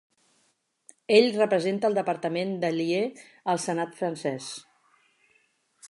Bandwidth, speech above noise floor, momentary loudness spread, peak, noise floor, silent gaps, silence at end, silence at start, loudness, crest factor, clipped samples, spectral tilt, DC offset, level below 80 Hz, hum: 11.5 kHz; 45 dB; 15 LU; -6 dBFS; -71 dBFS; none; 0.05 s; 1.1 s; -26 LUFS; 22 dB; under 0.1%; -5 dB/octave; under 0.1%; -82 dBFS; none